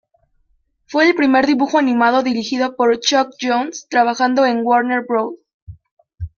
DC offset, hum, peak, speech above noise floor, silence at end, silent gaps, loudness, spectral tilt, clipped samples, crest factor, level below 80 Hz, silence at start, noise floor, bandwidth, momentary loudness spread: under 0.1%; none; -2 dBFS; 46 dB; 0.1 s; 5.54-5.67 s, 5.91-5.97 s; -16 LUFS; -3.5 dB/octave; under 0.1%; 16 dB; -50 dBFS; 0.9 s; -62 dBFS; 7.2 kHz; 7 LU